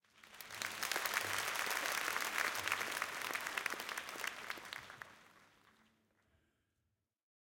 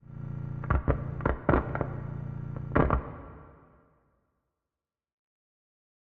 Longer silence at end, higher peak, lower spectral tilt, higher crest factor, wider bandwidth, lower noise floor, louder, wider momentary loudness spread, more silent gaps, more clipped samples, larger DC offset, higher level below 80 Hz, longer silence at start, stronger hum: second, 1.95 s vs 2.65 s; second, -16 dBFS vs -8 dBFS; second, 0 dB/octave vs -8.5 dB/octave; about the same, 28 dB vs 24 dB; first, 17 kHz vs 4.2 kHz; second, -86 dBFS vs under -90 dBFS; second, -39 LUFS vs -31 LUFS; about the same, 14 LU vs 16 LU; neither; neither; neither; second, -80 dBFS vs -40 dBFS; about the same, 0.15 s vs 0.1 s; neither